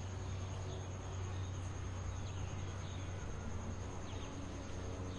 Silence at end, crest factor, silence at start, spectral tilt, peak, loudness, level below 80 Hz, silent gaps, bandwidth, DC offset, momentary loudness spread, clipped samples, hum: 0 s; 12 dB; 0 s; -5.5 dB/octave; -30 dBFS; -45 LUFS; -52 dBFS; none; 10.5 kHz; under 0.1%; 2 LU; under 0.1%; none